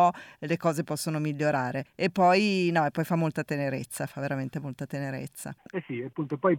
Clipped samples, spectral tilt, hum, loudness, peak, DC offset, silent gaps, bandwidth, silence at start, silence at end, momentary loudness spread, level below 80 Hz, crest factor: under 0.1%; -6 dB/octave; none; -29 LUFS; -10 dBFS; under 0.1%; none; 18 kHz; 0 s; 0 s; 13 LU; -68 dBFS; 16 dB